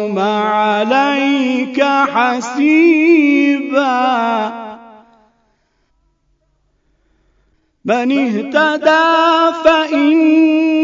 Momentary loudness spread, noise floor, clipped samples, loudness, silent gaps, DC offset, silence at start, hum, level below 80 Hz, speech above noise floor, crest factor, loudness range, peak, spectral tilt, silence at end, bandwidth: 7 LU; -61 dBFS; under 0.1%; -13 LUFS; none; under 0.1%; 0 s; none; -58 dBFS; 49 dB; 14 dB; 10 LU; 0 dBFS; -4.5 dB/octave; 0 s; 7.6 kHz